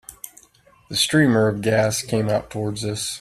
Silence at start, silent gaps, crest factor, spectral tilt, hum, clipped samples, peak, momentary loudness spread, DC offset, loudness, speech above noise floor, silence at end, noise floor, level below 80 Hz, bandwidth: 0.1 s; none; 18 dB; -4.5 dB/octave; none; under 0.1%; -4 dBFS; 16 LU; under 0.1%; -20 LUFS; 34 dB; 0 s; -54 dBFS; -52 dBFS; 15 kHz